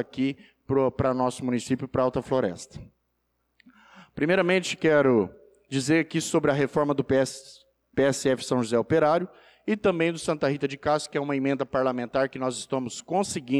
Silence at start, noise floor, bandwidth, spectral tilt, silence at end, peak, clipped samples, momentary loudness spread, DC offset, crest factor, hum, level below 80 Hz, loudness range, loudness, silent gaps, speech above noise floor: 0 s; -75 dBFS; 13.5 kHz; -5.5 dB/octave; 0 s; -12 dBFS; under 0.1%; 9 LU; under 0.1%; 14 dB; none; -58 dBFS; 4 LU; -26 LUFS; none; 50 dB